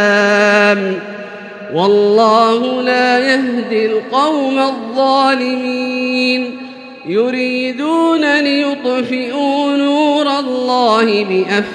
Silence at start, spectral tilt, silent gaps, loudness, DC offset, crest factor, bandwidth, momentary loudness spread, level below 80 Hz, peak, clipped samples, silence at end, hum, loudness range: 0 s; -4.5 dB/octave; none; -13 LUFS; under 0.1%; 14 dB; 11 kHz; 9 LU; -66 dBFS; 0 dBFS; under 0.1%; 0 s; none; 3 LU